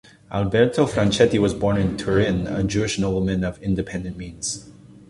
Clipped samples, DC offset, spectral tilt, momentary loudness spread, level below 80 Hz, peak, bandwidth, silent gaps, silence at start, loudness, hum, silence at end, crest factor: under 0.1%; under 0.1%; -5.5 dB/octave; 11 LU; -40 dBFS; -2 dBFS; 11.5 kHz; none; 0.3 s; -22 LUFS; none; 0.35 s; 18 dB